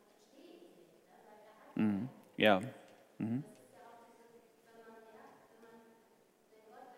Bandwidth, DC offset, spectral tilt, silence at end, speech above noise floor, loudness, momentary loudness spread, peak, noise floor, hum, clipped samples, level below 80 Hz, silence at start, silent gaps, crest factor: 16 kHz; under 0.1%; -6.5 dB/octave; 0.05 s; 36 dB; -36 LUFS; 30 LU; -16 dBFS; -69 dBFS; none; under 0.1%; -86 dBFS; 0.55 s; none; 26 dB